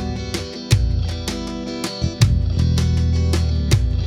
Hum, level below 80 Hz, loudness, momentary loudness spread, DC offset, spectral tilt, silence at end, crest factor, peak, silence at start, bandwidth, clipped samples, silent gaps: none; -24 dBFS; -20 LUFS; 8 LU; under 0.1%; -5.5 dB/octave; 0 s; 16 dB; -2 dBFS; 0 s; 14.5 kHz; under 0.1%; none